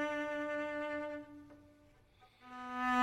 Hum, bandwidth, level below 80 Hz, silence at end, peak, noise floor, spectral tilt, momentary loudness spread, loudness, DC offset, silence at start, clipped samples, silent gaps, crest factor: none; 14.5 kHz; -72 dBFS; 0 s; -22 dBFS; -66 dBFS; -4.5 dB/octave; 21 LU; -40 LUFS; under 0.1%; 0 s; under 0.1%; none; 18 dB